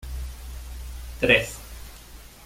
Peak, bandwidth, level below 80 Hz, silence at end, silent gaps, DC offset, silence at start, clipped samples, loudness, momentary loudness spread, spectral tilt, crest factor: -4 dBFS; 16.5 kHz; -38 dBFS; 0 s; none; under 0.1%; 0 s; under 0.1%; -21 LUFS; 24 LU; -4 dB/octave; 26 dB